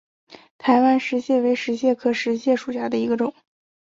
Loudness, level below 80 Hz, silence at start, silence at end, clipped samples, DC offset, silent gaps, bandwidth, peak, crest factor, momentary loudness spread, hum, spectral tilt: -21 LUFS; -68 dBFS; 0.3 s; 0.55 s; under 0.1%; under 0.1%; 0.51-0.59 s; 7.6 kHz; -4 dBFS; 16 dB; 7 LU; none; -5 dB/octave